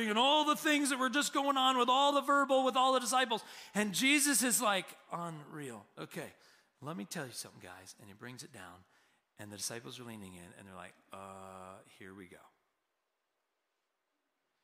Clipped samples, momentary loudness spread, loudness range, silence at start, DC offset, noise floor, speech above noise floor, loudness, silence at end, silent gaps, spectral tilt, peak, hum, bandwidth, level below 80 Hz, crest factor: under 0.1%; 24 LU; 22 LU; 0 s; under 0.1%; -85 dBFS; 50 dB; -31 LUFS; 2.25 s; none; -2 dB/octave; -16 dBFS; none; 16 kHz; -84 dBFS; 18 dB